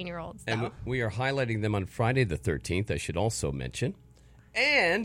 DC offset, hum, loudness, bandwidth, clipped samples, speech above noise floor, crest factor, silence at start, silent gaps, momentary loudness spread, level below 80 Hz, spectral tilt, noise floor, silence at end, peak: under 0.1%; none; -29 LUFS; 16 kHz; under 0.1%; 27 dB; 18 dB; 0 s; none; 10 LU; -50 dBFS; -5 dB/octave; -56 dBFS; 0 s; -12 dBFS